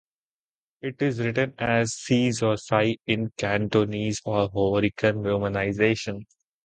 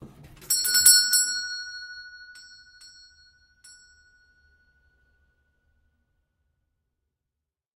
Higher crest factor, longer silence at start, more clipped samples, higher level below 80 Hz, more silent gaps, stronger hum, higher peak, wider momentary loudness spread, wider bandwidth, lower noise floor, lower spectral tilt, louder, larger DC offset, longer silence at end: second, 20 dB vs 28 dB; first, 0.85 s vs 0 s; neither; first, -52 dBFS vs -64 dBFS; neither; neither; second, -6 dBFS vs -2 dBFS; second, 5 LU vs 26 LU; second, 9.4 kHz vs 16 kHz; first, under -90 dBFS vs -86 dBFS; first, -5.5 dB/octave vs 3 dB/octave; second, -25 LUFS vs -19 LUFS; neither; second, 0.45 s vs 5.45 s